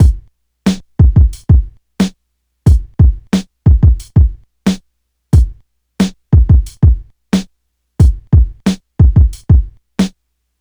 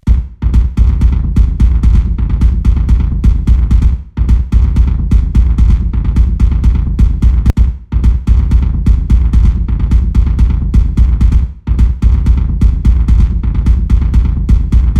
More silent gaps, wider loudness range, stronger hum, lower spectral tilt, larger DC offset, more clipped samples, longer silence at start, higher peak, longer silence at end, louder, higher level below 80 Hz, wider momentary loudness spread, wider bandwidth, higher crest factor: neither; about the same, 1 LU vs 0 LU; neither; second, -7.5 dB/octave vs -9 dB/octave; second, under 0.1% vs 1%; neither; about the same, 0 s vs 0.05 s; about the same, 0 dBFS vs 0 dBFS; first, 0.5 s vs 0 s; about the same, -13 LUFS vs -12 LUFS; about the same, -14 dBFS vs -10 dBFS; first, 9 LU vs 3 LU; first, 11.5 kHz vs 3.7 kHz; about the same, 12 dB vs 8 dB